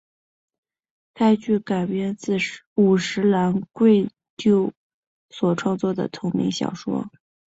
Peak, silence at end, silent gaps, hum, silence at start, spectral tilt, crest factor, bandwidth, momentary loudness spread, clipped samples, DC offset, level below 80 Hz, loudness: -6 dBFS; 0.4 s; 2.67-2.76 s, 4.30-4.37 s, 4.77-5.29 s; none; 1.15 s; -6.5 dB/octave; 16 dB; 8 kHz; 9 LU; under 0.1%; under 0.1%; -62 dBFS; -22 LUFS